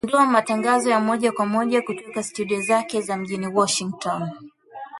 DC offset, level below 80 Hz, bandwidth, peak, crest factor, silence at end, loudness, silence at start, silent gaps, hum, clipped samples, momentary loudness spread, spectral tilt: under 0.1%; -66 dBFS; 11.5 kHz; -4 dBFS; 18 dB; 0 s; -22 LUFS; 0.05 s; none; none; under 0.1%; 11 LU; -4 dB/octave